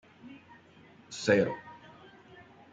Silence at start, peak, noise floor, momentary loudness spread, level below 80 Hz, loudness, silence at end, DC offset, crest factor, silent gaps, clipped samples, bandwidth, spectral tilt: 0.25 s; -12 dBFS; -57 dBFS; 28 LU; -72 dBFS; -29 LUFS; 0.95 s; under 0.1%; 24 dB; none; under 0.1%; 9.2 kHz; -5 dB/octave